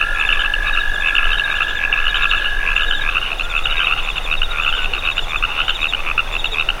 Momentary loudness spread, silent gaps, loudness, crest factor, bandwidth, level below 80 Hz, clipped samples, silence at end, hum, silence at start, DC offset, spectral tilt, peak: 4 LU; none; -17 LUFS; 16 dB; 15.5 kHz; -24 dBFS; under 0.1%; 0 s; none; 0 s; under 0.1%; -1.5 dB/octave; -2 dBFS